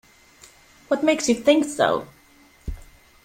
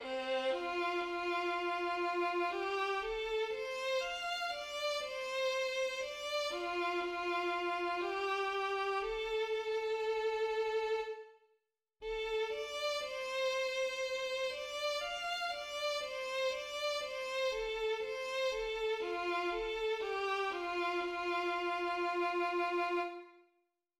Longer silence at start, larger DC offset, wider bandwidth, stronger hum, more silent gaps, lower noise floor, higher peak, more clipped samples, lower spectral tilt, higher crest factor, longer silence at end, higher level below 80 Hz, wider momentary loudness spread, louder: first, 0.9 s vs 0 s; neither; about the same, 16 kHz vs 15.5 kHz; neither; neither; second, -54 dBFS vs -80 dBFS; first, -4 dBFS vs -26 dBFS; neither; first, -3.5 dB/octave vs -2 dB/octave; first, 20 dB vs 12 dB; second, 0.4 s vs 0.6 s; first, -44 dBFS vs -64 dBFS; first, 20 LU vs 4 LU; first, -21 LUFS vs -36 LUFS